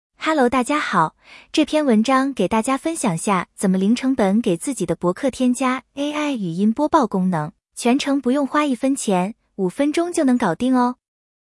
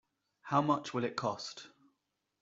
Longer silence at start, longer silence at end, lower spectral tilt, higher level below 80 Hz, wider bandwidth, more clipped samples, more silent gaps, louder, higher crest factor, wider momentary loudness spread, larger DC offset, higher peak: second, 0.2 s vs 0.45 s; second, 0.55 s vs 0.75 s; about the same, -5.5 dB/octave vs -5.5 dB/octave; first, -56 dBFS vs -78 dBFS; first, 12 kHz vs 7.8 kHz; neither; neither; first, -20 LUFS vs -35 LUFS; second, 16 dB vs 22 dB; second, 6 LU vs 18 LU; neither; first, -4 dBFS vs -16 dBFS